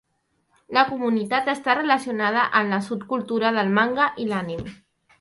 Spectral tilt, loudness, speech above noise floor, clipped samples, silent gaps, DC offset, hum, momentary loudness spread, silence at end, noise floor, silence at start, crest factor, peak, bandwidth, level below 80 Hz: -5.5 dB/octave; -22 LUFS; 48 dB; under 0.1%; none; under 0.1%; none; 8 LU; 0.45 s; -70 dBFS; 0.7 s; 20 dB; -4 dBFS; 11.5 kHz; -60 dBFS